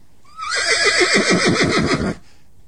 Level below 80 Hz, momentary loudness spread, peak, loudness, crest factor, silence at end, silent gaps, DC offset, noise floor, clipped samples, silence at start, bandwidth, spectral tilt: -42 dBFS; 12 LU; -2 dBFS; -16 LUFS; 16 dB; 0.5 s; none; 0.9%; -50 dBFS; under 0.1%; 0.35 s; 13 kHz; -3 dB/octave